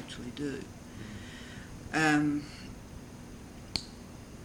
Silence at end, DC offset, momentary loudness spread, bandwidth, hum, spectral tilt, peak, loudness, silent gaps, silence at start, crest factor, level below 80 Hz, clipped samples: 0 s; under 0.1%; 21 LU; 16.5 kHz; none; -4.5 dB/octave; -12 dBFS; -33 LUFS; none; 0 s; 24 dB; -54 dBFS; under 0.1%